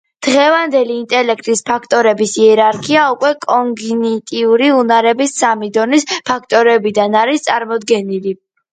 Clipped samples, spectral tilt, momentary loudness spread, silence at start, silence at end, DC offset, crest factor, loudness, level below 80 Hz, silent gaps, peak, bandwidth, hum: under 0.1%; -3.5 dB/octave; 7 LU; 0.2 s; 0.4 s; under 0.1%; 12 dB; -13 LUFS; -60 dBFS; none; 0 dBFS; 9.4 kHz; none